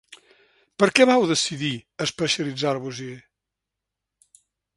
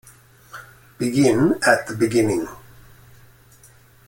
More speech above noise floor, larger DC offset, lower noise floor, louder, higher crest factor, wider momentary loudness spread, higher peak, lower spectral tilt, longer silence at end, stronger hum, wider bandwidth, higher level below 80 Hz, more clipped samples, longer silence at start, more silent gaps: first, 63 dB vs 32 dB; neither; first, -85 dBFS vs -51 dBFS; second, -22 LUFS vs -19 LUFS; about the same, 24 dB vs 22 dB; second, 15 LU vs 24 LU; about the same, 0 dBFS vs -2 dBFS; second, -3.5 dB/octave vs -5.5 dB/octave; about the same, 1.55 s vs 1.5 s; neither; second, 11.5 kHz vs 17 kHz; second, -66 dBFS vs -54 dBFS; neither; second, 0.1 s vs 0.55 s; neither